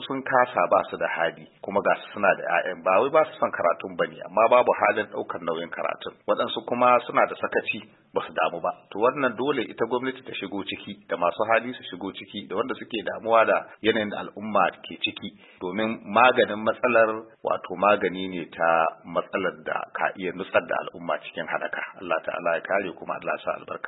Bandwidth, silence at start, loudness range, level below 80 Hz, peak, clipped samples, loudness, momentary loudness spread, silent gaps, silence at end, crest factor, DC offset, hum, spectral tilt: 4.1 kHz; 0 s; 5 LU; -70 dBFS; -4 dBFS; under 0.1%; -25 LUFS; 12 LU; none; 0 s; 22 dB; under 0.1%; none; -9 dB/octave